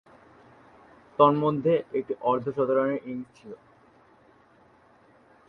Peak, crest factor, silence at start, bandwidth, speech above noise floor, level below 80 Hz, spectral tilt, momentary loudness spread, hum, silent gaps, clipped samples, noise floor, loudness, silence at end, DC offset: -6 dBFS; 24 dB; 1.2 s; 6.2 kHz; 33 dB; -68 dBFS; -9 dB/octave; 24 LU; none; none; under 0.1%; -59 dBFS; -25 LUFS; 1.95 s; under 0.1%